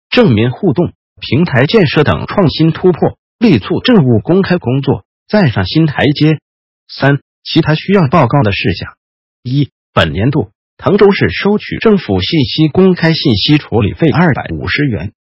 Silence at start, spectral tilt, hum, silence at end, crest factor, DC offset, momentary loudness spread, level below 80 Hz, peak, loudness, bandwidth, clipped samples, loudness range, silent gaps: 0.1 s; -8.5 dB/octave; none; 0.2 s; 12 dB; under 0.1%; 8 LU; -34 dBFS; 0 dBFS; -11 LUFS; 8 kHz; 0.3%; 3 LU; 0.95-1.16 s, 3.18-3.39 s, 5.05-5.26 s, 6.42-6.87 s, 7.21-7.42 s, 8.97-9.43 s, 9.72-9.93 s, 10.55-10.77 s